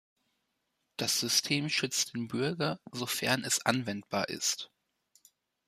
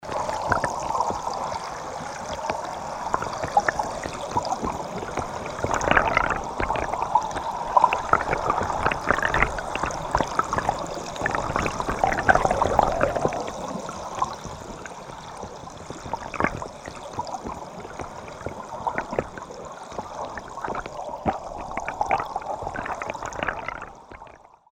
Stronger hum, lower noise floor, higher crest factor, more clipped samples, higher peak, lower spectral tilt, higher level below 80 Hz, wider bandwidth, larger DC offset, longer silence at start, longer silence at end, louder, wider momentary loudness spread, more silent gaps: neither; first, -81 dBFS vs -48 dBFS; about the same, 22 dB vs 26 dB; neither; second, -12 dBFS vs 0 dBFS; second, -2.5 dB/octave vs -4.5 dB/octave; second, -74 dBFS vs -42 dBFS; second, 15 kHz vs 17 kHz; neither; first, 1 s vs 0 s; first, 1 s vs 0.3 s; second, -31 LUFS vs -26 LUFS; second, 8 LU vs 16 LU; neither